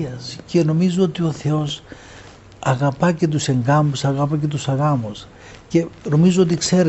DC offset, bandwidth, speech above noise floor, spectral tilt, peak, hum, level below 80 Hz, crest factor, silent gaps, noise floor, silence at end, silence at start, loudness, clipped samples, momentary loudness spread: under 0.1%; 8.2 kHz; 24 dB; -6 dB/octave; -4 dBFS; none; -50 dBFS; 16 dB; none; -42 dBFS; 0 s; 0 s; -19 LUFS; under 0.1%; 12 LU